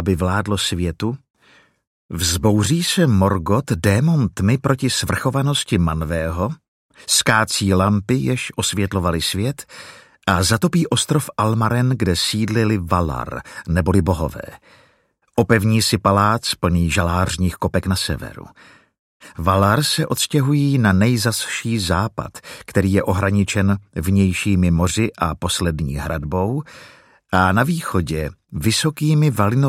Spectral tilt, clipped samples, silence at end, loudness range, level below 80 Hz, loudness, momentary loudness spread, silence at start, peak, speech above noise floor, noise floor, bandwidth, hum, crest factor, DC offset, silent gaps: -5 dB/octave; under 0.1%; 0 s; 3 LU; -38 dBFS; -18 LUFS; 10 LU; 0 s; 0 dBFS; 43 dB; -61 dBFS; 16 kHz; none; 18 dB; under 0.1%; 1.30-1.34 s, 1.87-2.09 s, 6.68-6.89 s, 18.99-19.20 s